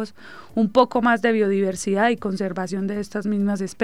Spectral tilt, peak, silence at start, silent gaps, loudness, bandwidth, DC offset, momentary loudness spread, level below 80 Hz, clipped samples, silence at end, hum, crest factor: -5.5 dB/octave; -2 dBFS; 0 s; none; -22 LUFS; 12.5 kHz; 0.5%; 8 LU; -58 dBFS; under 0.1%; 0 s; none; 18 dB